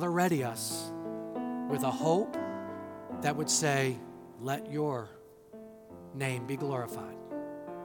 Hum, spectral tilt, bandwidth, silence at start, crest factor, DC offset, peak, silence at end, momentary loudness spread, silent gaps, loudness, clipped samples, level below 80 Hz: none; -4.5 dB/octave; 18 kHz; 0 s; 20 dB; under 0.1%; -14 dBFS; 0 s; 19 LU; none; -33 LUFS; under 0.1%; -72 dBFS